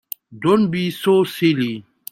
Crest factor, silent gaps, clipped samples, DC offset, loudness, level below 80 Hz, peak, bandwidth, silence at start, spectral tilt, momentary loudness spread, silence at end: 14 dB; none; under 0.1%; under 0.1%; -18 LUFS; -60 dBFS; -4 dBFS; 16.5 kHz; 0.3 s; -6.5 dB/octave; 11 LU; 0.3 s